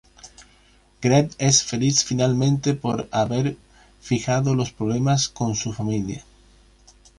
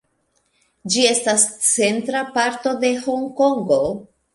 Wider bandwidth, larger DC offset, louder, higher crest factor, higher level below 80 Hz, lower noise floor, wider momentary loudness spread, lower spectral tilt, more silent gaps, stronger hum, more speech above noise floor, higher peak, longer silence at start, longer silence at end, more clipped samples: about the same, 11.5 kHz vs 11.5 kHz; neither; second, -22 LUFS vs -18 LUFS; about the same, 20 dB vs 18 dB; first, -50 dBFS vs -58 dBFS; second, -56 dBFS vs -66 dBFS; about the same, 9 LU vs 8 LU; first, -4.5 dB/octave vs -2 dB/octave; neither; neither; second, 34 dB vs 48 dB; about the same, -4 dBFS vs -2 dBFS; second, 0.25 s vs 0.85 s; first, 1 s vs 0.3 s; neither